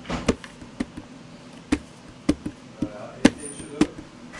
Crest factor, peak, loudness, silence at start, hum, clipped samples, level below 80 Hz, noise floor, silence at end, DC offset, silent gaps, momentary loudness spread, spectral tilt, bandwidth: 28 dB; 0 dBFS; -27 LUFS; 0 s; none; under 0.1%; -44 dBFS; -44 dBFS; 0 s; under 0.1%; none; 22 LU; -5 dB/octave; 11.5 kHz